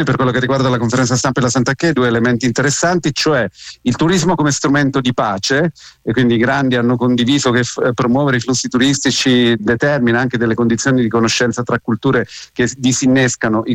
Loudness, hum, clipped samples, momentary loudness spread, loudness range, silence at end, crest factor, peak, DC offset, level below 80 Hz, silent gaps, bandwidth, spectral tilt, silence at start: -14 LUFS; none; under 0.1%; 4 LU; 1 LU; 0 s; 10 dB; -4 dBFS; under 0.1%; -46 dBFS; none; 10.5 kHz; -4.5 dB/octave; 0 s